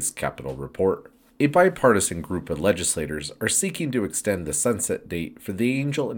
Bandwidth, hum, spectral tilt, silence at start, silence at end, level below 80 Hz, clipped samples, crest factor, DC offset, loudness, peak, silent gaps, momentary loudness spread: 19 kHz; none; -4 dB/octave; 0 s; 0 s; -50 dBFS; under 0.1%; 20 dB; under 0.1%; -24 LUFS; -4 dBFS; none; 12 LU